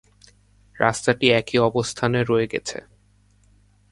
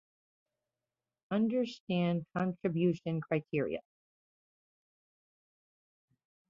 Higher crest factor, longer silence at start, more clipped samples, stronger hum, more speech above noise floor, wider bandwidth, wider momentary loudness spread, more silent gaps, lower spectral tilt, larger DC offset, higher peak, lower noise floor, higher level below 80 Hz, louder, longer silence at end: about the same, 22 dB vs 18 dB; second, 0.75 s vs 1.3 s; neither; first, 50 Hz at -55 dBFS vs none; second, 37 dB vs over 57 dB; first, 11.5 kHz vs 7.2 kHz; first, 10 LU vs 5 LU; second, none vs 1.80-1.87 s; second, -4.5 dB/octave vs -7 dB/octave; neither; first, 0 dBFS vs -18 dBFS; second, -58 dBFS vs under -90 dBFS; first, -54 dBFS vs -74 dBFS; first, -21 LUFS vs -34 LUFS; second, 1.1 s vs 2.7 s